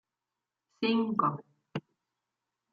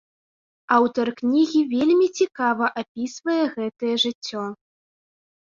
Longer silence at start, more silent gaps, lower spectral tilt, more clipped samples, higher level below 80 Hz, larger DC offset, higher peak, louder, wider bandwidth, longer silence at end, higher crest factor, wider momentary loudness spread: about the same, 0.8 s vs 0.7 s; second, none vs 2.88-2.95 s, 4.15-4.21 s; first, -8 dB/octave vs -4 dB/octave; neither; second, -80 dBFS vs -68 dBFS; neither; second, -14 dBFS vs -4 dBFS; second, -30 LUFS vs -22 LUFS; second, 6.6 kHz vs 7.6 kHz; about the same, 0.95 s vs 0.9 s; about the same, 22 dB vs 20 dB; first, 14 LU vs 11 LU